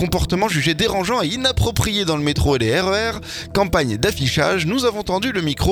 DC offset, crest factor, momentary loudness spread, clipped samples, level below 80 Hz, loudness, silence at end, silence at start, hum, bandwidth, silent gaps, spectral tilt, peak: under 0.1%; 18 dB; 3 LU; under 0.1%; -32 dBFS; -19 LUFS; 0 s; 0 s; none; 19 kHz; none; -4.5 dB/octave; -2 dBFS